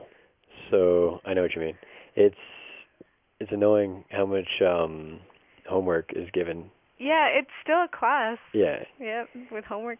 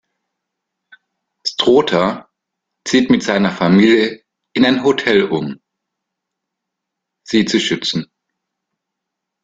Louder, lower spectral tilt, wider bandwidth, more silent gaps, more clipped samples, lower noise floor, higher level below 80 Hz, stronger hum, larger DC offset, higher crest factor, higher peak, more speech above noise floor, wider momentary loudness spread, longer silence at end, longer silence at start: second, -26 LUFS vs -15 LUFS; first, -9 dB/octave vs -5 dB/octave; second, 3.7 kHz vs 9.2 kHz; neither; neither; second, -57 dBFS vs -79 dBFS; about the same, -58 dBFS vs -56 dBFS; neither; neither; about the same, 18 dB vs 18 dB; second, -10 dBFS vs 0 dBFS; second, 32 dB vs 66 dB; first, 18 LU vs 12 LU; second, 0 s vs 1.4 s; second, 0 s vs 1.45 s